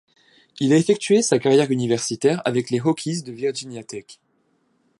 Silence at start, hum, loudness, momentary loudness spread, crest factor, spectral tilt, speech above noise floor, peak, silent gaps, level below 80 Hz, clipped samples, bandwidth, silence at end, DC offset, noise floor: 0.6 s; none; -20 LUFS; 15 LU; 18 dB; -5 dB/octave; 46 dB; -4 dBFS; none; -68 dBFS; under 0.1%; 11.5 kHz; 0.85 s; under 0.1%; -66 dBFS